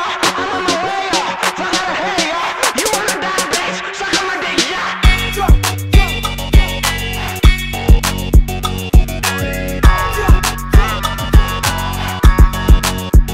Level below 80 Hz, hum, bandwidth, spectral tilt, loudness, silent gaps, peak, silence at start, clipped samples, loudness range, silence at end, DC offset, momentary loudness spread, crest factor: -16 dBFS; none; 16.5 kHz; -4 dB/octave; -15 LUFS; none; 0 dBFS; 0 s; under 0.1%; 1 LU; 0 s; under 0.1%; 4 LU; 12 dB